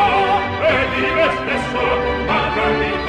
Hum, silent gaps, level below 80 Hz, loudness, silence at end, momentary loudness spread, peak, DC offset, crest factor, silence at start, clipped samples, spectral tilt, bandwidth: none; none; -34 dBFS; -17 LUFS; 0 s; 3 LU; -4 dBFS; under 0.1%; 12 dB; 0 s; under 0.1%; -5.5 dB/octave; 12 kHz